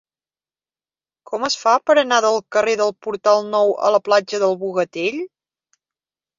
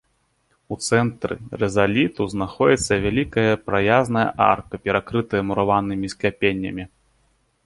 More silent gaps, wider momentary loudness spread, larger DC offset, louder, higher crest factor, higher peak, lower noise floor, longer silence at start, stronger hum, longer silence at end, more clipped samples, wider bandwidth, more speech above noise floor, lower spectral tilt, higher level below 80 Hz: neither; about the same, 9 LU vs 10 LU; neither; first, -18 LUFS vs -21 LUFS; about the same, 18 dB vs 18 dB; about the same, -2 dBFS vs -2 dBFS; first, under -90 dBFS vs -67 dBFS; first, 1.3 s vs 0.7 s; neither; first, 1.1 s vs 0.8 s; neither; second, 7.6 kHz vs 11.5 kHz; first, over 72 dB vs 46 dB; second, -3 dB/octave vs -5.5 dB/octave; second, -68 dBFS vs -46 dBFS